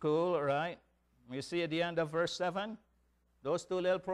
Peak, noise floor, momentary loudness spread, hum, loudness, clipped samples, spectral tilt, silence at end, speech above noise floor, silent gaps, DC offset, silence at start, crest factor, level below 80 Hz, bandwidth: -22 dBFS; -73 dBFS; 12 LU; none; -35 LUFS; under 0.1%; -5.5 dB/octave; 0 s; 39 dB; none; under 0.1%; 0 s; 14 dB; -72 dBFS; 12 kHz